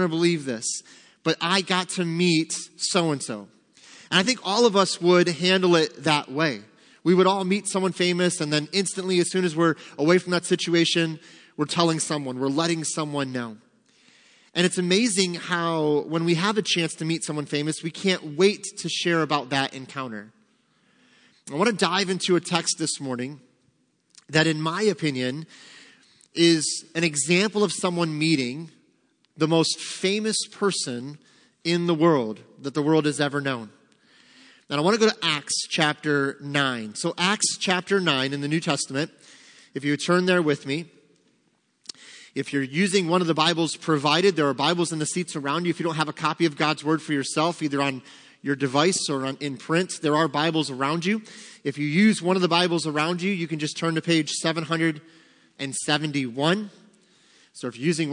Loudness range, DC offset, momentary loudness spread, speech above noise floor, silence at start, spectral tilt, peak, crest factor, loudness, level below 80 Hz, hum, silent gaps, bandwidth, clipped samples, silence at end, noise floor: 4 LU; under 0.1%; 11 LU; 44 dB; 0 s; -4 dB/octave; -2 dBFS; 22 dB; -23 LUFS; -74 dBFS; none; none; 10.5 kHz; under 0.1%; 0 s; -68 dBFS